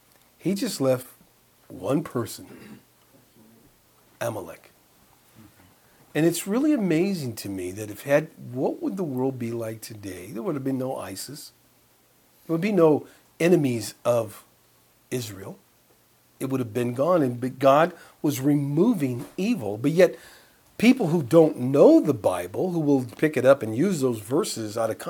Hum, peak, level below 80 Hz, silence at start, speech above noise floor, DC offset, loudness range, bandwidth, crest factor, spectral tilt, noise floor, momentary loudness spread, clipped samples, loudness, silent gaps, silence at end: none; -4 dBFS; -68 dBFS; 0.45 s; 37 dB; under 0.1%; 13 LU; 19 kHz; 20 dB; -6 dB/octave; -60 dBFS; 16 LU; under 0.1%; -24 LUFS; none; 0 s